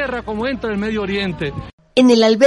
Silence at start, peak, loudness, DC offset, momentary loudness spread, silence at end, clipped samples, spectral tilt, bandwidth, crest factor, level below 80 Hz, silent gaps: 0 s; -2 dBFS; -18 LUFS; under 0.1%; 13 LU; 0 s; under 0.1%; -5.5 dB/octave; 11.5 kHz; 16 dB; -40 dBFS; 1.73-1.78 s